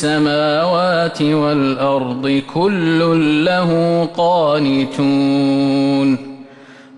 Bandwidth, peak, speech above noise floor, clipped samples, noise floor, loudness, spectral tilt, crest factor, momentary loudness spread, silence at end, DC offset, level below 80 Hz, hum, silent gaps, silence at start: 10.5 kHz; -6 dBFS; 25 dB; under 0.1%; -40 dBFS; -15 LUFS; -6.5 dB/octave; 10 dB; 4 LU; 0 s; under 0.1%; -54 dBFS; none; none; 0 s